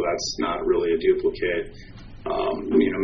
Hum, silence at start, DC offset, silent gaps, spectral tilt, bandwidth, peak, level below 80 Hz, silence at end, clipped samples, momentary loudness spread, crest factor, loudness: none; 0 s; under 0.1%; none; -3.5 dB/octave; 6.6 kHz; -6 dBFS; -44 dBFS; 0 s; under 0.1%; 12 LU; 16 dB; -24 LUFS